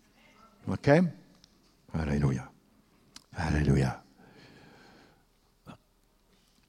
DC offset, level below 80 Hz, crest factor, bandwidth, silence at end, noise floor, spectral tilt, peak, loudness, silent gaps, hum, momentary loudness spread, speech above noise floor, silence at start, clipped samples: under 0.1%; -46 dBFS; 24 dB; 11.5 kHz; 0.95 s; -67 dBFS; -7.5 dB/octave; -8 dBFS; -29 LUFS; none; none; 20 LU; 41 dB; 0.65 s; under 0.1%